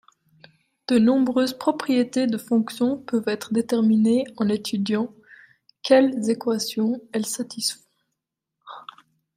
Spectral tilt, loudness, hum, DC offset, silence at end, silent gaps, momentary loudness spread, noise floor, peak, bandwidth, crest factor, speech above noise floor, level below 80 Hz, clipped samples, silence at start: -5 dB/octave; -22 LUFS; none; under 0.1%; 0.55 s; none; 13 LU; -82 dBFS; -4 dBFS; 15.5 kHz; 18 dB; 61 dB; -70 dBFS; under 0.1%; 0.9 s